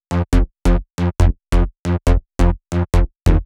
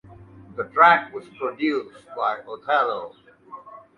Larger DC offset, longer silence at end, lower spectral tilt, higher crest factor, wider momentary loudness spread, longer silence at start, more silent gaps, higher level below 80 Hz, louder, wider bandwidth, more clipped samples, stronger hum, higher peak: neither; second, 0 s vs 0.2 s; first, -7 dB/octave vs -5.5 dB/octave; second, 14 dB vs 20 dB; second, 3 LU vs 25 LU; about the same, 0.1 s vs 0.1 s; first, 1.79-1.83 s vs none; first, -18 dBFS vs -64 dBFS; first, -19 LUFS vs -22 LUFS; about the same, 11.5 kHz vs 10.5 kHz; neither; neither; about the same, -2 dBFS vs -4 dBFS